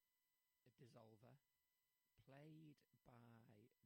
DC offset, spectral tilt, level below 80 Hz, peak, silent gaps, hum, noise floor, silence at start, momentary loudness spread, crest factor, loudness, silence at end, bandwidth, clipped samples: under 0.1%; -6.5 dB/octave; under -90 dBFS; -50 dBFS; none; none; under -90 dBFS; 0 s; 4 LU; 22 dB; -68 LUFS; 0 s; 16 kHz; under 0.1%